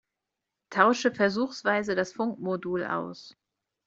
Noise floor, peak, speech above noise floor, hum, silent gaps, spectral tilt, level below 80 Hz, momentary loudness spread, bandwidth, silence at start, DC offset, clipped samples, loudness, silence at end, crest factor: -86 dBFS; -4 dBFS; 59 dB; none; none; -5 dB/octave; -70 dBFS; 10 LU; 7.8 kHz; 0.7 s; under 0.1%; under 0.1%; -27 LUFS; 0.55 s; 24 dB